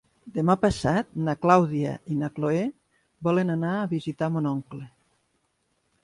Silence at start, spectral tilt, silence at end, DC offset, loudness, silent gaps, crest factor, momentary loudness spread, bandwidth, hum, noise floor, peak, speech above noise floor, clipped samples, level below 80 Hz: 0.25 s; -7.5 dB/octave; 1.15 s; under 0.1%; -25 LUFS; none; 22 dB; 12 LU; 11.5 kHz; none; -72 dBFS; -4 dBFS; 48 dB; under 0.1%; -52 dBFS